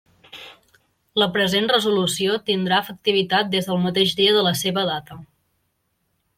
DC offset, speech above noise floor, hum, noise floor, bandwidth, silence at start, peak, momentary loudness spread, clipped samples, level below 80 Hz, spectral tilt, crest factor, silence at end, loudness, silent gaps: under 0.1%; 51 dB; none; -71 dBFS; 16.5 kHz; 0.35 s; -4 dBFS; 9 LU; under 0.1%; -62 dBFS; -4 dB/octave; 18 dB; 1.15 s; -20 LUFS; none